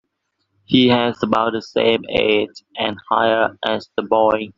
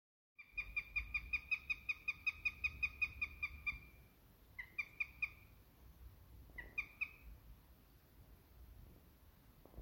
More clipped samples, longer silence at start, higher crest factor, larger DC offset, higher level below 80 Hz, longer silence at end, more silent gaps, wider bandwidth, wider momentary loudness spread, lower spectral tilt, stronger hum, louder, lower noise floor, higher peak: neither; first, 0.7 s vs 0.4 s; about the same, 16 dB vs 20 dB; neither; first, -52 dBFS vs -60 dBFS; about the same, 0.05 s vs 0 s; neither; second, 7.4 kHz vs 16.5 kHz; second, 8 LU vs 23 LU; about the same, -3 dB/octave vs -3.5 dB/octave; neither; first, -18 LUFS vs -42 LUFS; first, -72 dBFS vs -66 dBFS; first, -2 dBFS vs -28 dBFS